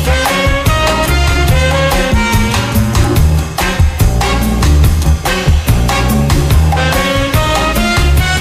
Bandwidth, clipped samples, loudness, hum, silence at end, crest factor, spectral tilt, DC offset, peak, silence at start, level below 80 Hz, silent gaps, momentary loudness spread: 16 kHz; under 0.1%; -11 LUFS; none; 0 s; 10 dB; -5 dB/octave; under 0.1%; 0 dBFS; 0 s; -14 dBFS; none; 2 LU